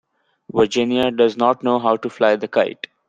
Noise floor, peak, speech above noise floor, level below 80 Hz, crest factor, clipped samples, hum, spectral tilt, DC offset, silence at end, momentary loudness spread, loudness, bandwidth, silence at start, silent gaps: -43 dBFS; -2 dBFS; 25 dB; -58 dBFS; 16 dB; under 0.1%; none; -5 dB/octave; under 0.1%; 0.35 s; 4 LU; -18 LUFS; 8.8 kHz; 0.55 s; none